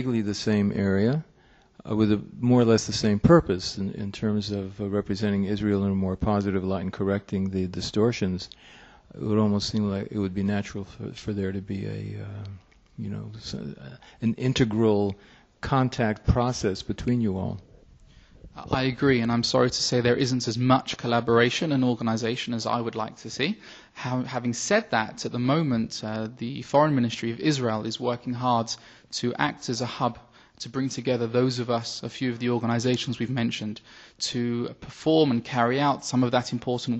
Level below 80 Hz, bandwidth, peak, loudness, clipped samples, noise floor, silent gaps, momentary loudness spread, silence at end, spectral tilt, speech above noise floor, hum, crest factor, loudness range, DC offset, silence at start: -48 dBFS; 8.4 kHz; -6 dBFS; -26 LUFS; under 0.1%; -54 dBFS; none; 13 LU; 0 s; -5.5 dB/octave; 28 dB; none; 20 dB; 5 LU; under 0.1%; 0 s